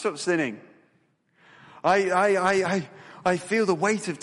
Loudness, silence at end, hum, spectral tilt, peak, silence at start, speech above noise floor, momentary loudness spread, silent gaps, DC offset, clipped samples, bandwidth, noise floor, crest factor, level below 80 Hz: -24 LUFS; 0 s; none; -4.5 dB/octave; -8 dBFS; 0 s; 43 dB; 9 LU; none; under 0.1%; under 0.1%; 11.5 kHz; -67 dBFS; 16 dB; -68 dBFS